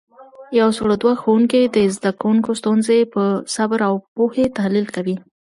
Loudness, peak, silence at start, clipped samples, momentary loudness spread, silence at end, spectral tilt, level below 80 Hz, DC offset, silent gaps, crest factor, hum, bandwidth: -18 LUFS; -4 dBFS; 0.2 s; under 0.1%; 6 LU; 0.4 s; -5.5 dB/octave; -54 dBFS; under 0.1%; 4.08-4.16 s; 14 dB; none; 11.5 kHz